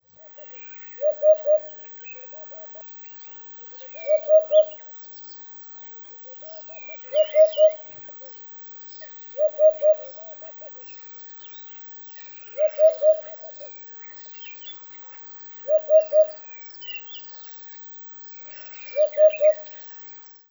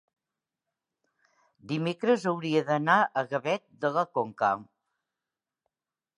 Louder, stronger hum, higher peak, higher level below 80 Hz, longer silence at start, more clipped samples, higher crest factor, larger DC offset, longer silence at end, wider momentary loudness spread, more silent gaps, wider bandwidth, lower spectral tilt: first, -24 LUFS vs -28 LUFS; neither; about the same, -6 dBFS vs -8 dBFS; about the same, -82 dBFS vs -78 dBFS; second, 0.1 s vs 1.65 s; neither; about the same, 18 dB vs 22 dB; neither; second, 0.05 s vs 1.55 s; first, 12 LU vs 8 LU; neither; first, over 20 kHz vs 11 kHz; second, -0.5 dB/octave vs -6 dB/octave